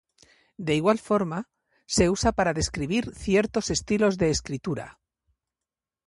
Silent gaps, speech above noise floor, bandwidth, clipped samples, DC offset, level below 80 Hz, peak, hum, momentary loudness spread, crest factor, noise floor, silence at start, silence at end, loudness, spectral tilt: none; 65 dB; 11.5 kHz; under 0.1%; under 0.1%; -44 dBFS; -6 dBFS; none; 11 LU; 20 dB; -90 dBFS; 0.6 s; 1.15 s; -25 LUFS; -4.5 dB/octave